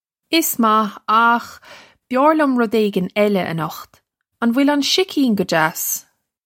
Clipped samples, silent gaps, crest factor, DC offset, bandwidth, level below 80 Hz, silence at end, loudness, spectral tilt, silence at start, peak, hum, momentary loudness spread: under 0.1%; none; 16 dB; under 0.1%; 16.5 kHz; -66 dBFS; 0.45 s; -17 LUFS; -4 dB/octave; 0.3 s; -2 dBFS; none; 9 LU